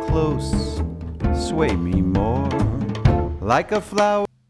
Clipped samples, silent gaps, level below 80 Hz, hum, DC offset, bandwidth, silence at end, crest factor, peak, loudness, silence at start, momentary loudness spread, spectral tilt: under 0.1%; none; -28 dBFS; none; under 0.1%; 11 kHz; 0.25 s; 18 dB; -4 dBFS; -21 LUFS; 0 s; 5 LU; -7 dB/octave